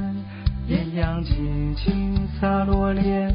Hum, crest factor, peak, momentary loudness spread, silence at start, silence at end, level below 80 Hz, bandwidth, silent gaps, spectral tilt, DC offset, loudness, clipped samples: none; 14 dB; -8 dBFS; 7 LU; 0 s; 0 s; -28 dBFS; 5.2 kHz; none; -7 dB/octave; under 0.1%; -24 LUFS; under 0.1%